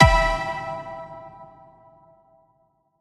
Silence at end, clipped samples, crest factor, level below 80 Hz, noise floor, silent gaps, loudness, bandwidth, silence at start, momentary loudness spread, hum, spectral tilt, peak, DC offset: 1.55 s; under 0.1%; 24 dB; -32 dBFS; -66 dBFS; none; -24 LUFS; 12.5 kHz; 0 s; 26 LU; none; -5.5 dB/octave; 0 dBFS; under 0.1%